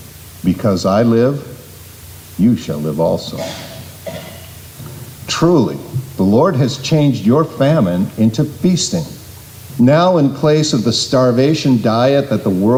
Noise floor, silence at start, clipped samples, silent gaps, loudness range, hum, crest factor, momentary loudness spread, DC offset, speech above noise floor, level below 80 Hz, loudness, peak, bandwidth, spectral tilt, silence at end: -36 dBFS; 0 s; under 0.1%; none; 7 LU; none; 12 dB; 20 LU; under 0.1%; 23 dB; -46 dBFS; -14 LUFS; -2 dBFS; 16.5 kHz; -6 dB/octave; 0 s